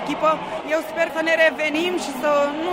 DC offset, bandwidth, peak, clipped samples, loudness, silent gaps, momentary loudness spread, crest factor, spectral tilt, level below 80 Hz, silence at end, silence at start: under 0.1%; 16 kHz; -6 dBFS; under 0.1%; -21 LUFS; none; 7 LU; 16 dB; -3.5 dB/octave; -58 dBFS; 0 s; 0 s